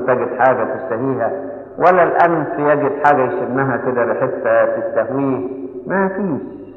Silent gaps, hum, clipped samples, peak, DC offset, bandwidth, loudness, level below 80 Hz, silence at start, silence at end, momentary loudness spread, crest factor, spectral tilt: none; none; under 0.1%; 0 dBFS; under 0.1%; 5.4 kHz; -17 LUFS; -58 dBFS; 0 s; 0 s; 9 LU; 16 dB; -9.5 dB/octave